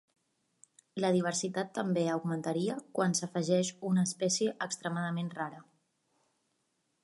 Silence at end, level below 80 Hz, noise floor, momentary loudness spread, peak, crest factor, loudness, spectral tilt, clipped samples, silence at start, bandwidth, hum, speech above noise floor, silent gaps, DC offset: 1.4 s; -80 dBFS; -79 dBFS; 6 LU; -14 dBFS; 20 dB; -32 LUFS; -4.5 dB/octave; under 0.1%; 0.95 s; 11.5 kHz; none; 47 dB; none; under 0.1%